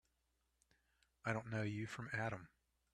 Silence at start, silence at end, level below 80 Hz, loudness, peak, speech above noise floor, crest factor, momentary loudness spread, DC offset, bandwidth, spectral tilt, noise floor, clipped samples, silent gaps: 1.25 s; 0.45 s; -74 dBFS; -45 LUFS; -26 dBFS; 40 dB; 22 dB; 5 LU; under 0.1%; 12 kHz; -6.5 dB/octave; -84 dBFS; under 0.1%; none